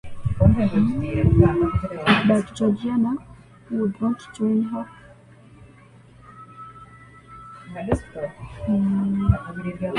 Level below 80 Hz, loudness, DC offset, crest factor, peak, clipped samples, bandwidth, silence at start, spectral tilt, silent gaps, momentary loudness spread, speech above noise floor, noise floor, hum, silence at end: -34 dBFS; -22 LUFS; under 0.1%; 22 dB; -2 dBFS; under 0.1%; 10.5 kHz; 0.05 s; -8 dB/octave; none; 22 LU; 27 dB; -49 dBFS; none; 0 s